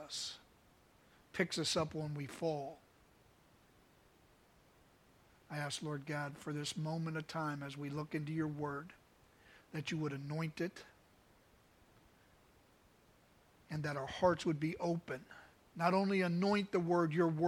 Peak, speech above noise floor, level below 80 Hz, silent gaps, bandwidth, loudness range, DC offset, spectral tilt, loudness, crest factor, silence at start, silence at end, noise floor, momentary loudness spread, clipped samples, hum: -18 dBFS; 30 dB; -72 dBFS; none; 15.5 kHz; 12 LU; under 0.1%; -5.5 dB/octave; -39 LUFS; 22 dB; 0 s; 0 s; -68 dBFS; 14 LU; under 0.1%; none